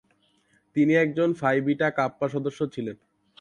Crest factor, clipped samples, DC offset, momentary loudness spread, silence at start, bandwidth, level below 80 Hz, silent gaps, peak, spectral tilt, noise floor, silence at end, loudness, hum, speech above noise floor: 18 dB; under 0.1%; under 0.1%; 10 LU; 0.75 s; 10 kHz; -68 dBFS; none; -8 dBFS; -7.5 dB/octave; -66 dBFS; 0.45 s; -25 LUFS; none; 42 dB